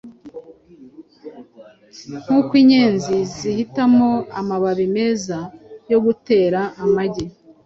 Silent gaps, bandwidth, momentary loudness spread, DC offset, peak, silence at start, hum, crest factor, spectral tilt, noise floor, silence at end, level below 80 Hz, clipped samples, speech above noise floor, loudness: none; 7.6 kHz; 22 LU; under 0.1%; -4 dBFS; 0.05 s; none; 16 dB; -6 dB/octave; -46 dBFS; 0.35 s; -54 dBFS; under 0.1%; 29 dB; -18 LUFS